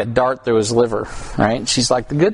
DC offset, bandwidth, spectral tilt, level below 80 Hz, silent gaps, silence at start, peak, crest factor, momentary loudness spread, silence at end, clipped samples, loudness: under 0.1%; 11 kHz; -4.5 dB/octave; -40 dBFS; none; 0 s; 0 dBFS; 16 dB; 5 LU; 0 s; under 0.1%; -17 LUFS